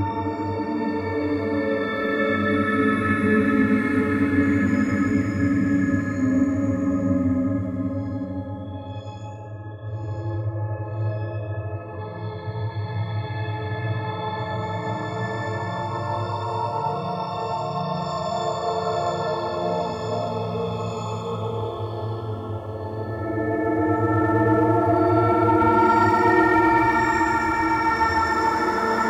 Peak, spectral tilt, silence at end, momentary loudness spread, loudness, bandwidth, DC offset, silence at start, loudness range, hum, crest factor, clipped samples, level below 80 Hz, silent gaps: -8 dBFS; -7.5 dB/octave; 0 s; 12 LU; -23 LUFS; 11 kHz; under 0.1%; 0 s; 11 LU; none; 16 dB; under 0.1%; -48 dBFS; none